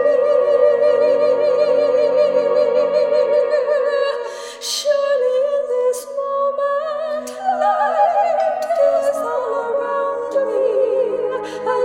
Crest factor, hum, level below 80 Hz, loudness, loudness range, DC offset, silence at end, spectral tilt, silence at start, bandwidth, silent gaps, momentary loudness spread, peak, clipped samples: 14 dB; none; -64 dBFS; -17 LUFS; 4 LU; under 0.1%; 0 s; -2.5 dB/octave; 0 s; 15.5 kHz; none; 8 LU; -4 dBFS; under 0.1%